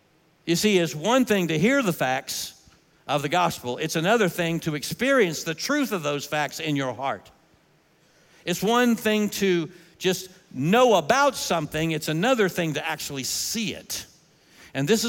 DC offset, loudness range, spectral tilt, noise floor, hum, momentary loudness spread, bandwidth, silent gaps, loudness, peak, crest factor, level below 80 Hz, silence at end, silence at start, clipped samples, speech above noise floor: under 0.1%; 4 LU; -4 dB/octave; -61 dBFS; none; 10 LU; 17 kHz; none; -24 LUFS; -6 dBFS; 18 dB; -62 dBFS; 0 s; 0.45 s; under 0.1%; 38 dB